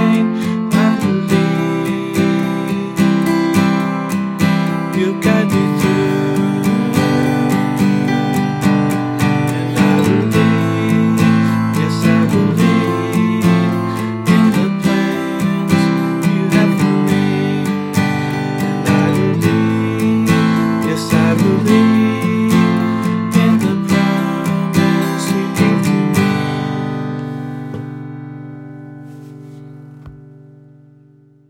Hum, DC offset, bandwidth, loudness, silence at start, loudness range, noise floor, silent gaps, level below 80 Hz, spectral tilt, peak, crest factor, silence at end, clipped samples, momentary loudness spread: none; under 0.1%; 16.5 kHz; -15 LUFS; 0 s; 4 LU; -47 dBFS; none; -52 dBFS; -6.5 dB/octave; 0 dBFS; 14 dB; 1.2 s; under 0.1%; 7 LU